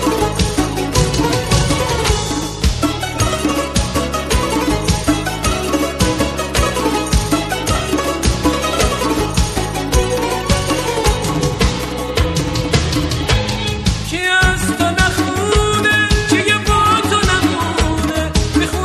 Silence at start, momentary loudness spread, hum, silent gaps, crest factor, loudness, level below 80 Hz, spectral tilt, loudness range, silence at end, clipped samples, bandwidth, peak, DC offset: 0 s; 5 LU; none; none; 14 dB; -16 LUFS; -24 dBFS; -4 dB/octave; 3 LU; 0 s; under 0.1%; 13.5 kHz; 0 dBFS; 0.2%